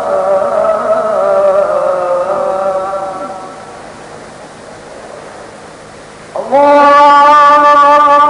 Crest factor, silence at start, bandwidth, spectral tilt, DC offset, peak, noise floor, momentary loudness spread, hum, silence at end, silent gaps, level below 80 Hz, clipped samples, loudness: 10 dB; 0 s; 11 kHz; -4 dB/octave; under 0.1%; 0 dBFS; -32 dBFS; 25 LU; none; 0 s; none; -50 dBFS; under 0.1%; -8 LUFS